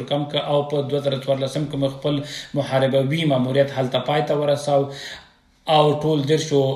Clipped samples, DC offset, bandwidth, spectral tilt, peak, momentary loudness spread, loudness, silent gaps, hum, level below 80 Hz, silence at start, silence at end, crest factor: under 0.1%; under 0.1%; 13 kHz; -6 dB/octave; -4 dBFS; 8 LU; -21 LUFS; none; none; -56 dBFS; 0 s; 0 s; 16 dB